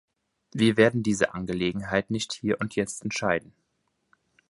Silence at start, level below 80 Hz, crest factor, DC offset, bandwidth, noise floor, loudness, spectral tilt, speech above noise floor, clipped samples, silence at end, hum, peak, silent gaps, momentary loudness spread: 0.55 s; -56 dBFS; 22 dB; under 0.1%; 11.5 kHz; -75 dBFS; -26 LUFS; -5 dB/octave; 49 dB; under 0.1%; 1.1 s; none; -6 dBFS; none; 9 LU